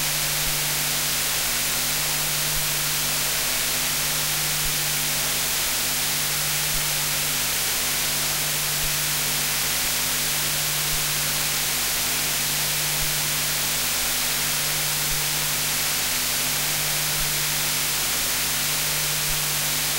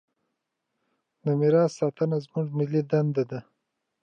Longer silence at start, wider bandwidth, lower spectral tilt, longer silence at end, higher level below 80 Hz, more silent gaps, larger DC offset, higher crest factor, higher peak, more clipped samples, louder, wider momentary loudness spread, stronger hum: second, 0 s vs 1.25 s; first, 16 kHz vs 8.8 kHz; second, -0.5 dB/octave vs -8.5 dB/octave; second, 0 s vs 0.6 s; first, -44 dBFS vs -78 dBFS; neither; neither; about the same, 14 dB vs 16 dB; about the same, -10 dBFS vs -10 dBFS; neither; first, -21 LUFS vs -26 LUFS; second, 0 LU vs 10 LU; first, 50 Hz at -40 dBFS vs none